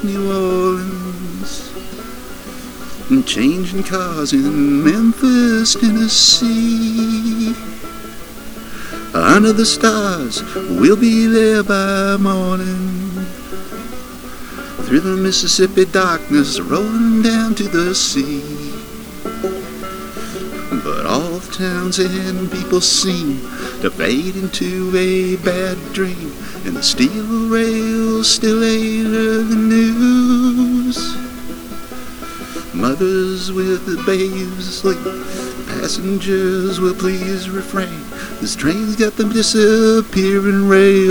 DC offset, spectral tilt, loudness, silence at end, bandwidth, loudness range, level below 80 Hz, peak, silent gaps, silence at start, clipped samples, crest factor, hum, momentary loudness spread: under 0.1%; -4 dB/octave; -15 LUFS; 0 s; over 20 kHz; 7 LU; -40 dBFS; 0 dBFS; none; 0 s; under 0.1%; 16 dB; none; 17 LU